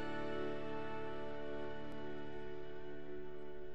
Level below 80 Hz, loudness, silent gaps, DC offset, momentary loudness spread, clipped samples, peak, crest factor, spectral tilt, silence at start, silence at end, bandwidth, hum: -62 dBFS; -47 LUFS; none; 0.9%; 7 LU; under 0.1%; -28 dBFS; 14 dB; -7 dB/octave; 0 s; 0 s; over 20 kHz; none